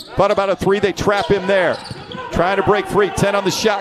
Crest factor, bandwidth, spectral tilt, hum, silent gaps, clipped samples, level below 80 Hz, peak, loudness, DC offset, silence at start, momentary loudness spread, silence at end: 14 dB; 14 kHz; -4.5 dB/octave; none; none; under 0.1%; -40 dBFS; -2 dBFS; -17 LUFS; under 0.1%; 0 s; 7 LU; 0 s